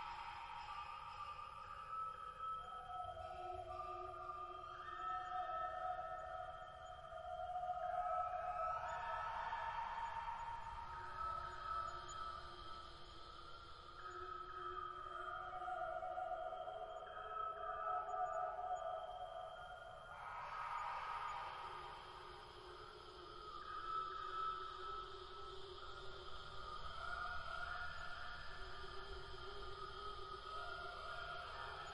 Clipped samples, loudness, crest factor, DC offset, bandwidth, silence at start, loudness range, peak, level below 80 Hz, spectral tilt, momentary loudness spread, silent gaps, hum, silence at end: under 0.1%; -48 LUFS; 16 dB; under 0.1%; 11.5 kHz; 0 s; 5 LU; -32 dBFS; -64 dBFS; -4 dB/octave; 10 LU; none; none; 0 s